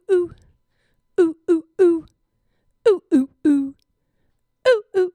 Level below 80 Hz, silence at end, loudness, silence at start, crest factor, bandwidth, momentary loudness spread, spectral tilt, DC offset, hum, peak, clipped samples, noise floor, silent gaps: -62 dBFS; 0.05 s; -20 LUFS; 0.1 s; 18 dB; 10 kHz; 8 LU; -5.5 dB/octave; under 0.1%; none; -4 dBFS; under 0.1%; -68 dBFS; none